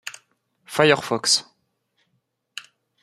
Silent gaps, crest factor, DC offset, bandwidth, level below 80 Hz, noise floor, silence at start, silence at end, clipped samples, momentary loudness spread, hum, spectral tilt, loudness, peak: none; 24 dB; under 0.1%; 15 kHz; -66 dBFS; -73 dBFS; 0.05 s; 0.4 s; under 0.1%; 21 LU; none; -2.5 dB/octave; -19 LUFS; 0 dBFS